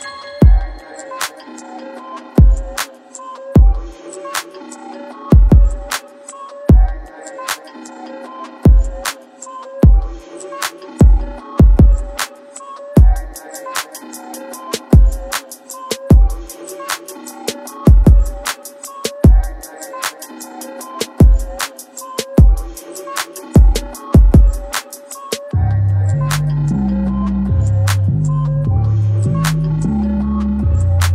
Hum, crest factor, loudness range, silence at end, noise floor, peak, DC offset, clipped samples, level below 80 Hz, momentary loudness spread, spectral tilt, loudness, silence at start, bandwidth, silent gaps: none; 14 dB; 3 LU; 0 s; -34 dBFS; 0 dBFS; under 0.1%; under 0.1%; -16 dBFS; 19 LU; -6 dB/octave; -15 LUFS; 0 s; 16 kHz; none